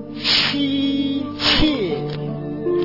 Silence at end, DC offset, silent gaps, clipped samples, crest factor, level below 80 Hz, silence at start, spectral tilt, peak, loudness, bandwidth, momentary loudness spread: 0 s; 0.4%; none; under 0.1%; 16 dB; -36 dBFS; 0 s; -5 dB/octave; -4 dBFS; -19 LUFS; 5.8 kHz; 11 LU